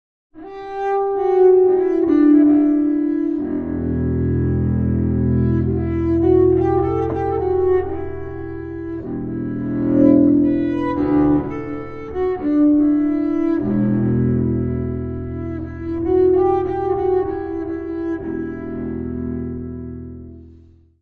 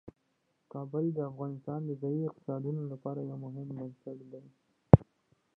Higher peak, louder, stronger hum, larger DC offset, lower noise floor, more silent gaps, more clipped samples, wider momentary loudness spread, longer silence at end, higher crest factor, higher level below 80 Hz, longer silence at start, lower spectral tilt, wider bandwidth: about the same, -2 dBFS vs -2 dBFS; first, -18 LUFS vs -32 LUFS; neither; first, 0.2% vs under 0.1%; second, -47 dBFS vs -77 dBFS; neither; neither; second, 14 LU vs 23 LU; about the same, 0.5 s vs 0.55 s; second, 16 dB vs 32 dB; first, -36 dBFS vs -50 dBFS; first, 0.35 s vs 0.05 s; second, -11.5 dB/octave vs -13 dB/octave; first, 4.2 kHz vs 3.4 kHz